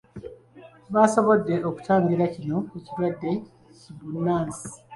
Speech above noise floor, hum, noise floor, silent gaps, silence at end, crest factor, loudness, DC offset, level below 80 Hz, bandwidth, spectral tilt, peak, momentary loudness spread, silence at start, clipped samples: 26 dB; none; -50 dBFS; none; 0 s; 20 dB; -24 LUFS; under 0.1%; -60 dBFS; 11.5 kHz; -7 dB/octave; -4 dBFS; 18 LU; 0.15 s; under 0.1%